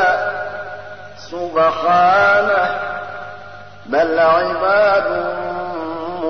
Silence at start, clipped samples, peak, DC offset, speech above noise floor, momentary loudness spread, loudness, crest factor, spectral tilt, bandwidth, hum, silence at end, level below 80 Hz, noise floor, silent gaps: 0 s; under 0.1%; -4 dBFS; 0.9%; 22 dB; 20 LU; -16 LUFS; 14 dB; -5.5 dB/octave; 6.4 kHz; 50 Hz at -45 dBFS; 0 s; -54 dBFS; -37 dBFS; none